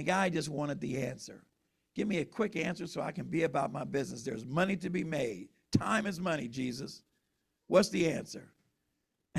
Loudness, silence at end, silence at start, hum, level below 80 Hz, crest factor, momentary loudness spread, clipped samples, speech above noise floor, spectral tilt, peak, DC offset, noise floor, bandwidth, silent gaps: -34 LUFS; 0 s; 0 s; none; -64 dBFS; 22 dB; 14 LU; under 0.1%; 49 dB; -5.5 dB/octave; -12 dBFS; under 0.1%; -82 dBFS; 14.5 kHz; none